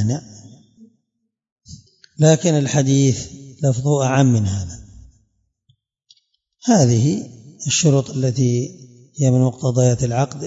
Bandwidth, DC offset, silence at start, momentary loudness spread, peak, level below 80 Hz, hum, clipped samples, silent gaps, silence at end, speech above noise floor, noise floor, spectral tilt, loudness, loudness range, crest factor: 7.8 kHz; under 0.1%; 0 s; 13 LU; 0 dBFS; -52 dBFS; none; under 0.1%; 1.52-1.56 s; 0 s; 59 dB; -76 dBFS; -6 dB/octave; -18 LUFS; 4 LU; 18 dB